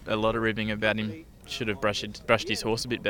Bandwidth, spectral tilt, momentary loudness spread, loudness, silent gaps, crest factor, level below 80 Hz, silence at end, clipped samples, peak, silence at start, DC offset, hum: 19 kHz; -4.5 dB/octave; 9 LU; -28 LUFS; none; 24 dB; -50 dBFS; 0 s; under 0.1%; -4 dBFS; 0 s; under 0.1%; none